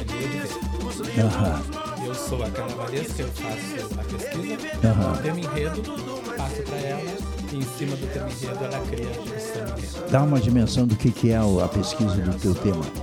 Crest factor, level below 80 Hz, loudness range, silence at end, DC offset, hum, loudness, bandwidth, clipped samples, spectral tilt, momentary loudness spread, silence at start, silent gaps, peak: 20 dB; -36 dBFS; 7 LU; 0 s; under 0.1%; none; -26 LUFS; 17.5 kHz; under 0.1%; -6.5 dB/octave; 10 LU; 0 s; none; -6 dBFS